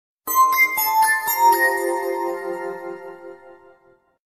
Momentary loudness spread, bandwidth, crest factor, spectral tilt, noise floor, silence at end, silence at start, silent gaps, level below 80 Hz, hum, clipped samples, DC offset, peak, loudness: 18 LU; 15.5 kHz; 16 dB; -1 dB/octave; -57 dBFS; 0.75 s; 0.25 s; none; -72 dBFS; none; under 0.1%; under 0.1%; -6 dBFS; -18 LUFS